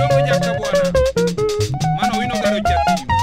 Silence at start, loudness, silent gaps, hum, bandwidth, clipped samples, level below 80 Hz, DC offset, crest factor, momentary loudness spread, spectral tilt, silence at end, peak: 0 s; -17 LUFS; none; none; 16 kHz; under 0.1%; -32 dBFS; under 0.1%; 14 dB; 4 LU; -5.5 dB/octave; 0 s; -4 dBFS